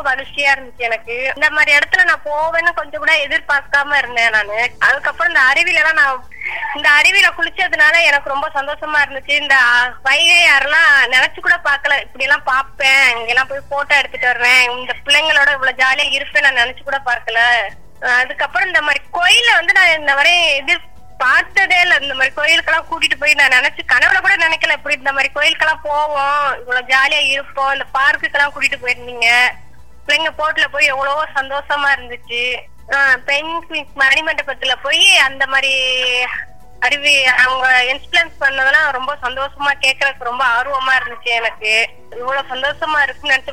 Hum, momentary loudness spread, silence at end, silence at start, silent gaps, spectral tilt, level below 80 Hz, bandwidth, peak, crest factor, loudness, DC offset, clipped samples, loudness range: none; 10 LU; 0 s; 0 s; none; 0 dB/octave; -46 dBFS; 17 kHz; 0 dBFS; 14 dB; -13 LUFS; 2%; under 0.1%; 4 LU